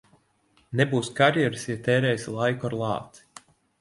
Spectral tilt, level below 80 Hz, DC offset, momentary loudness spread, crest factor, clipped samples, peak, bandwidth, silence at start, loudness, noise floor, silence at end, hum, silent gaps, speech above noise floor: -5.5 dB/octave; -62 dBFS; under 0.1%; 10 LU; 20 dB; under 0.1%; -6 dBFS; 11.5 kHz; 0.7 s; -25 LUFS; -65 dBFS; 0.65 s; none; none; 40 dB